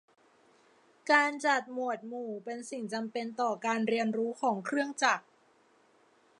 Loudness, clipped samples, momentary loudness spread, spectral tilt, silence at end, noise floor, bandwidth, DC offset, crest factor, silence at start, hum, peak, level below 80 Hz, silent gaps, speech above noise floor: -31 LUFS; under 0.1%; 13 LU; -3.5 dB/octave; 1.2 s; -66 dBFS; 11 kHz; under 0.1%; 22 dB; 1.05 s; none; -10 dBFS; -90 dBFS; none; 35 dB